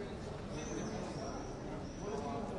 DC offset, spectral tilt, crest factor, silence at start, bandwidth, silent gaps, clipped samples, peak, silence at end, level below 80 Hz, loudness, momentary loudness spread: under 0.1%; -5.5 dB/octave; 14 dB; 0 s; 11.5 kHz; none; under 0.1%; -28 dBFS; 0 s; -54 dBFS; -43 LUFS; 4 LU